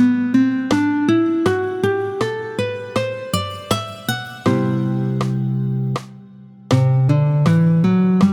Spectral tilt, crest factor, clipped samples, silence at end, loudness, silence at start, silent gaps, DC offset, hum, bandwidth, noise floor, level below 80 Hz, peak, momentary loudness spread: -7 dB/octave; 16 dB; under 0.1%; 0 s; -18 LUFS; 0 s; none; under 0.1%; none; 18.5 kHz; -41 dBFS; -52 dBFS; -2 dBFS; 9 LU